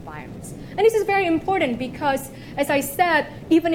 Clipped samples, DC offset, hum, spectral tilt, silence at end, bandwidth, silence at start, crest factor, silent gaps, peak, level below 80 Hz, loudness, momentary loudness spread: under 0.1%; under 0.1%; none; -4.5 dB/octave; 0 s; 17 kHz; 0 s; 18 dB; none; -4 dBFS; -48 dBFS; -21 LUFS; 15 LU